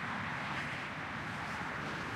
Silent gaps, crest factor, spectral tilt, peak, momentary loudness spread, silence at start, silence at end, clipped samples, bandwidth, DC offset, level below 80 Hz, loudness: none; 14 dB; -4.5 dB/octave; -26 dBFS; 2 LU; 0 s; 0 s; under 0.1%; 16 kHz; under 0.1%; -62 dBFS; -39 LUFS